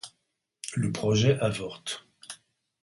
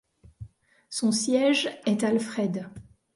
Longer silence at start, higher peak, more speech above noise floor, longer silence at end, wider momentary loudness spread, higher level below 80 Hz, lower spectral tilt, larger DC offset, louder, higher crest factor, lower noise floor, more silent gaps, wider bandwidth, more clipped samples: second, 0.05 s vs 0.4 s; about the same, -10 dBFS vs -12 dBFS; first, 52 dB vs 22 dB; first, 0.5 s vs 0.35 s; first, 21 LU vs 13 LU; about the same, -58 dBFS vs -60 dBFS; first, -5.5 dB/octave vs -4 dB/octave; neither; about the same, -28 LUFS vs -26 LUFS; about the same, 20 dB vs 16 dB; first, -79 dBFS vs -48 dBFS; neither; about the same, 11.5 kHz vs 11.5 kHz; neither